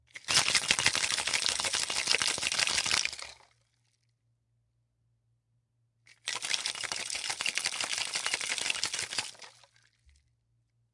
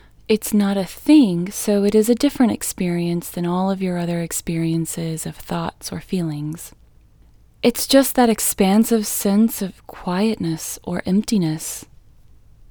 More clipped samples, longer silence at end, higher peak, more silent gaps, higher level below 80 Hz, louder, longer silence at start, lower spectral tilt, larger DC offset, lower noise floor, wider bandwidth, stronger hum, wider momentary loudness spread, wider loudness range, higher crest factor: neither; first, 1.4 s vs 0.85 s; about the same, -2 dBFS vs 0 dBFS; neither; second, -68 dBFS vs -48 dBFS; second, -29 LUFS vs -19 LUFS; second, 0.15 s vs 0.3 s; second, 1 dB/octave vs -5 dB/octave; neither; first, -75 dBFS vs -50 dBFS; second, 11.5 kHz vs over 20 kHz; neither; about the same, 10 LU vs 12 LU; first, 11 LU vs 7 LU; first, 32 dB vs 20 dB